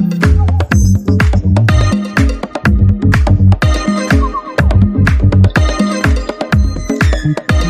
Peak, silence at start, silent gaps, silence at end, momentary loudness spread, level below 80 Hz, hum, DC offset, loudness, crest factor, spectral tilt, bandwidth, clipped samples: 0 dBFS; 0 s; none; 0 s; 5 LU; -16 dBFS; none; under 0.1%; -12 LUFS; 10 dB; -6.5 dB/octave; 10.5 kHz; under 0.1%